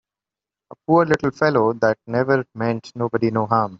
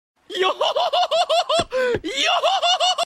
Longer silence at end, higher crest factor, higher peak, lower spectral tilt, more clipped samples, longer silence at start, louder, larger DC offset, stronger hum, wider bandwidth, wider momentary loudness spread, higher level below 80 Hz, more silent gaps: about the same, 0.05 s vs 0 s; about the same, 18 dB vs 14 dB; first, -2 dBFS vs -6 dBFS; first, -6 dB/octave vs -1.5 dB/octave; neither; first, 0.9 s vs 0.3 s; about the same, -20 LUFS vs -19 LUFS; neither; neither; second, 7.6 kHz vs 14 kHz; about the same, 7 LU vs 5 LU; about the same, -56 dBFS vs -54 dBFS; neither